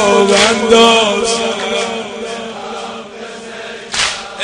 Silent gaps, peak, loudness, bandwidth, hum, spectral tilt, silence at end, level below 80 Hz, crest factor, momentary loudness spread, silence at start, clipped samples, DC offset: none; 0 dBFS; -12 LUFS; 10.5 kHz; none; -2.5 dB/octave; 0 s; -46 dBFS; 14 dB; 19 LU; 0 s; under 0.1%; under 0.1%